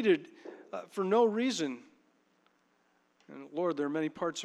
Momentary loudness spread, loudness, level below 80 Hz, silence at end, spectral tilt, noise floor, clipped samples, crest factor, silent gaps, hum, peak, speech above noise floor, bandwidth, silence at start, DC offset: 22 LU; -32 LUFS; -86 dBFS; 0 s; -4.5 dB/octave; -72 dBFS; under 0.1%; 20 dB; none; none; -14 dBFS; 40 dB; 12 kHz; 0 s; under 0.1%